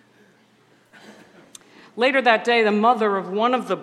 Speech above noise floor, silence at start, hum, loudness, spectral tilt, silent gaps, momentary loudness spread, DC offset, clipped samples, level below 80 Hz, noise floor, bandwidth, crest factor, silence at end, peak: 38 dB; 1.1 s; none; -19 LUFS; -5 dB/octave; none; 5 LU; under 0.1%; under 0.1%; -80 dBFS; -57 dBFS; 12.5 kHz; 22 dB; 0 s; 0 dBFS